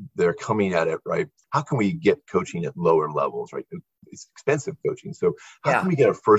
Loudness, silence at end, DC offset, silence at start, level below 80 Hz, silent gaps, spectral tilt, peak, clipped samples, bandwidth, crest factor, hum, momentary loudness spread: -24 LUFS; 0 s; under 0.1%; 0 s; -60 dBFS; none; -6.5 dB/octave; -4 dBFS; under 0.1%; 9.2 kHz; 18 dB; none; 12 LU